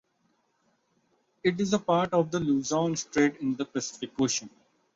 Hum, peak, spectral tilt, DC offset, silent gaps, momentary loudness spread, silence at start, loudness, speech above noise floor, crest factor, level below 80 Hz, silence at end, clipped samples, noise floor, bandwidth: none; -10 dBFS; -4.5 dB/octave; under 0.1%; none; 7 LU; 1.45 s; -28 LUFS; 45 dB; 18 dB; -64 dBFS; 0.45 s; under 0.1%; -72 dBFS; 7.8 kHz